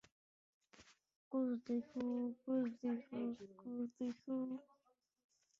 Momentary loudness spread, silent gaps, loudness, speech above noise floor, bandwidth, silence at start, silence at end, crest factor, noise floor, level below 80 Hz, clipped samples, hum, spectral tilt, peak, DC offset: 7 LU; 1.16-1.31 s; -44 LUFS; 39 dB; 7.2 kHz; 0.8 s; 1 s; 16 dB; -81 dBFS; -86 dBFS; under 0.1%; none; -6.5 dB/octave; -30 dBFS; under 0.1%